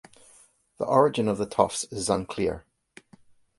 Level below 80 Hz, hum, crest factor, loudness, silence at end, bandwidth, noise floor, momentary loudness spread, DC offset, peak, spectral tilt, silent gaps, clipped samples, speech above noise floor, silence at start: -54 dBFS; none; 24 dB; -26 LUFS; 1 s; 11.5 kHz; -58 dBFS; 9 LU; under 0.1%; -4 dBFS; -5 dB/octave; none; under 0.1%; 34 dB; 0.8 s